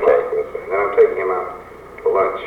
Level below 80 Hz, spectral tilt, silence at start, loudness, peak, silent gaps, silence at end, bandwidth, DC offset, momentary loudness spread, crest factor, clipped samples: -50 dBFS; -6.5 dB/octave; 0 s; -18 LUFS; -4 dBFS; none; 0 s; 4.5 kHz; under 0.1%; 15 LU; 14 dB; under 0.1%